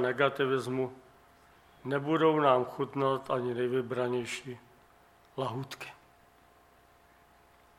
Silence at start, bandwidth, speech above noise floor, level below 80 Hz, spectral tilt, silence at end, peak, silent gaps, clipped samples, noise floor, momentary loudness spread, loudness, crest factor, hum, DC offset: 0 s; 15 kHz; 31 dB; -72 dBFS; -6 dB/octave; 1.85 s; -10 dBFS; none; under 0.1%; -62 dBFS; 18 LU; -31 LUFS; 22 dB; none; under 0.1%